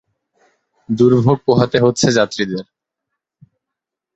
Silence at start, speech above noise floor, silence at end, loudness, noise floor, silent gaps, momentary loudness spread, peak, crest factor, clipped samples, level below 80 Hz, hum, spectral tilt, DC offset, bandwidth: 0.9 s; 69 dB; 1.55 s; -15 LUFS; -83 dBFS; none; 11 LU; 0 dBFS; 18 dB; under 0.1%; -52 dBFS; none; -5.5 dB/octave; under 0.1%; 8.2 kHz